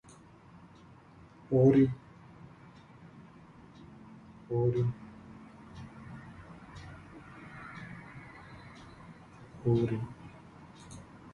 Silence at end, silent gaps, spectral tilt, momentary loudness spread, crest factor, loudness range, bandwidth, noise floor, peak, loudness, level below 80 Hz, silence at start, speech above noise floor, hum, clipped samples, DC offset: 0.05 s; none; -9 dB/octave; 25 LU; 22 dB; 16 LU; 10.5 kHz; -56 dBFS; -12 dBFS; -30 LUFS; -60 dBFS; 1.5 s; 29 dB; none; under 0.1%; under 0.1%